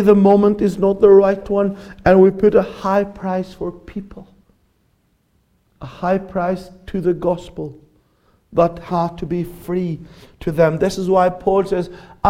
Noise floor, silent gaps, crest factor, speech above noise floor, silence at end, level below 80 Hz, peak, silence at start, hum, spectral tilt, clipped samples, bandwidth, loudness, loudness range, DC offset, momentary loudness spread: -62 dBFS; none; 16 dB; 45 dB; 0 s; -42 dBFS; 0 dBFS; 0 s; none; -8 dB/octave; under 0.1%; 13.5 kHz; -17 LUFS; 11 LU; under 0.1%; 18 LU